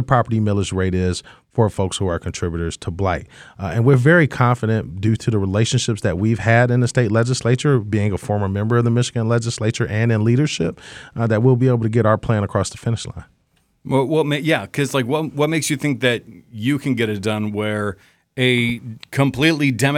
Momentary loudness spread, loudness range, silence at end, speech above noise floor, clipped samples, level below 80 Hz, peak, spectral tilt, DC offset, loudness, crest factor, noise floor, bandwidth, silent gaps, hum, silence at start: 9 LU; 3 LU; 0 s; 44 dB; under 0.1%; -44 dBFS; 0 dBFS; -6 dB/octave; under 0.1%; -19 LUFS; 18 dB; -63 dBFS; 15.5 kHz; none; none; 0 s